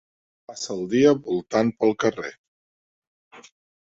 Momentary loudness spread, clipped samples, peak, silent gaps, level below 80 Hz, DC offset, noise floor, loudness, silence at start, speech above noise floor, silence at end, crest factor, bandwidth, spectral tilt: 16 LU; under 0.1%; -4 dBFS; 2.38-3.31 s; -62 dBFS; under 0.1%; under -90 dBFS; -22 LUFS; 0.5 s; over 68 dB; 0.45 s; 20 dB; 7.8 kHz; -5.5 dB/octave